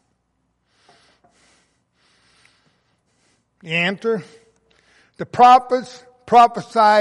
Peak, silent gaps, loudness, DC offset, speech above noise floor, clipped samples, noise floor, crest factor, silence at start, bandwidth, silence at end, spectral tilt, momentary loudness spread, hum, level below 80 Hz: -2 dBFS; none; -16 LUFS; under 0.1%; 54 dB; under 0.1%; -69 dBFS; 18 dB; 3.65 s; 11 kHz; 0 s; -5 dB/octave; 17 LU; none; -62 dBFS